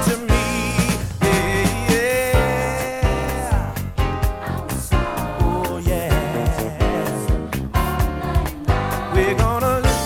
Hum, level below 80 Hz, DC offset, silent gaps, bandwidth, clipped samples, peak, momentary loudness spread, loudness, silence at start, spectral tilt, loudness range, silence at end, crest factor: none; -26 dBFS; under 0.1%; none; 18.5 kHz; under 0.1%; -2 dBFS; 6 LU; -20 LUFS; 0 s; -5.5 dB/octave; 3 LU; 0 s; 16 dB